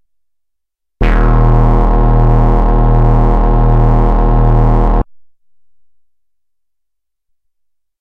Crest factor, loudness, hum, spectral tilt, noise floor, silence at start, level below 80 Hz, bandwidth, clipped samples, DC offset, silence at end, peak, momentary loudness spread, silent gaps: 10 dB; -12 LUFS; none; -10 dB/octave; -76 dBFS; 1 s; -12 dBFS; 3.6 kHz; under 0.1%; under 0.1%; 3 s; 0 dBFS; 4 LU; none